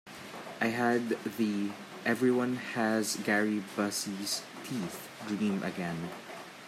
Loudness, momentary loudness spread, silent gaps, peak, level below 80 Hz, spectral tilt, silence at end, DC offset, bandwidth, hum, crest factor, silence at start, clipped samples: -32 LUFS; 13 LU; none; -16 dBFS; -78 dBFS; -4 dB/octave; 0 s; under 0.1%; 16 kHz; none; 18 dB; 0.05 s; under 0.1%